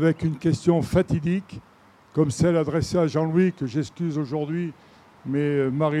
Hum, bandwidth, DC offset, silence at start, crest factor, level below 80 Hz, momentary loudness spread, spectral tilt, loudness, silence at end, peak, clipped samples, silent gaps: none; 12 kHz; under 0.1%; 0 s; 18 dB; -50 dBFS; 9 LU; -7.5 dB/octave; -24 LUFS; 0 s; -6 dBFS; under 0.1%; none